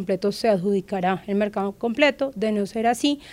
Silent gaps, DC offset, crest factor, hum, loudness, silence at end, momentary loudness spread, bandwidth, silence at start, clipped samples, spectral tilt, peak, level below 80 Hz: none; under 0.1%; 18 dB; none; -23 LUFS; 0 s; 5 LU; 15.5 kHz; 0 s; under 0.1%; -5.5 dB/octave; -4 dBFS; -58 dBFS